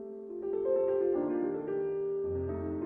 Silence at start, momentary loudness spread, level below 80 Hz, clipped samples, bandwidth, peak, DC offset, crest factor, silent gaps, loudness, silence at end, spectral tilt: 0 s; 7 LU; -58 dBFS; under 0.1%; 3 kHz; -20 dBFS; under 0.1%; 12 dB; none; -33 LUFS; 0 s; -12 dB/octave